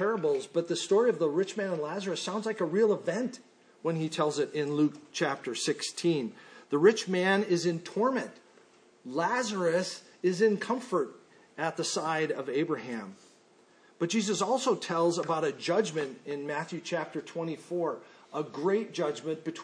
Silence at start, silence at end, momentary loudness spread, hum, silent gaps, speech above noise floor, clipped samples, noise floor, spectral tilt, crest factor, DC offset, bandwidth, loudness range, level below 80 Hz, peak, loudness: 0 s; 0 s; 10 LU; none; none; 32 dB; under 0.1%; -61 dBFS; -4.5 dB/octave; 20 dB; under 0.1%; 10.5 kHz; 5 LU; -84 dBFS; -10 dBFS; -30 LUFS